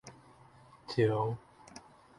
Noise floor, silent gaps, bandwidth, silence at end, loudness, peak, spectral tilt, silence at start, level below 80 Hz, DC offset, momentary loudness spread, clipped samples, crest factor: -59 dBFS; none; 11.5 kHz; 0.4 s; -33 LUFS; -18 dBFS; -7 dB/octave; 0.05 s; -66 dBFS; under 0.1%; 24 LU; under 0.1%; 20 dB